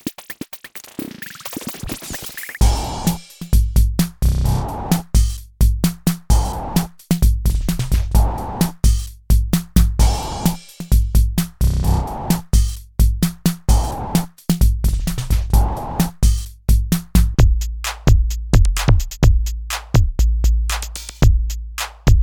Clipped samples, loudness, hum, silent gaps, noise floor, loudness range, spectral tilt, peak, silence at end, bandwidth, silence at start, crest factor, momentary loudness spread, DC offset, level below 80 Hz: under 0.1%; -19 LUFS; none; none; -37 dBFS; 3 LU; -5.5 dB/octave; 0 dBFS; 0 s; over 20 kHz; 0.05 s; 16 dB; 11 LU; under 0.1%; -18 dBFS